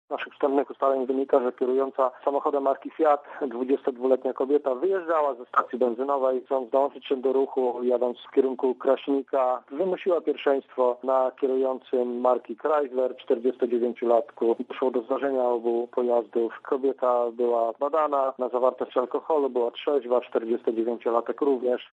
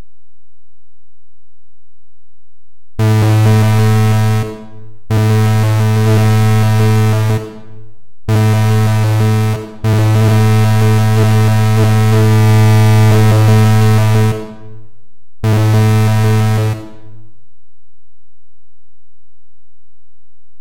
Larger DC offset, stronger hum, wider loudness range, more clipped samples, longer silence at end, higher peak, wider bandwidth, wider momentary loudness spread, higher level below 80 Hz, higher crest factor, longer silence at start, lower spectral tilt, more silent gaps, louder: neither; neither; second, 1 LU vs 6 LU; neither; about the same, 0.05 s vs 0 s; second, -8 dBFS vs -2 dBFS; second, 7.4 kHz vs 16 kHz; second, 3 LU vs 9 LU; second, -82 dBFS vs -38 dBFS; first, 16 dB vs 10 dB; about the same, 0.1 s vs 0 s; about the same, -7 dB/octave vs -7 dB/octave; neither; second, -26 LUFS vs -11 LUFS